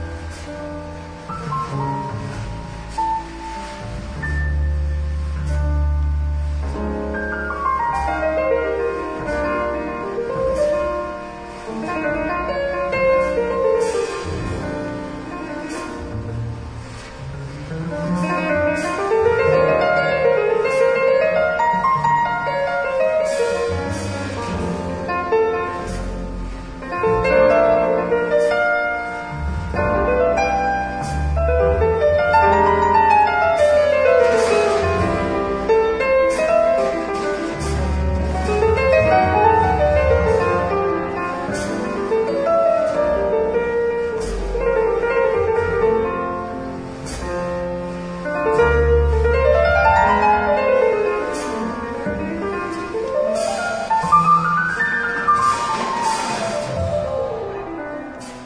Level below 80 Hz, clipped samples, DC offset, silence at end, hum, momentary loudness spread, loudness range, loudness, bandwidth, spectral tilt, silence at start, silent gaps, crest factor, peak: -30 dBFS; under 0.1%; under 0.1%; 0 s; none; 14 LU; 8 LU; -19 LUFS; 10.5 kHz; -6 dB/octave; 0 s; none; 16 dB; -2 dBFS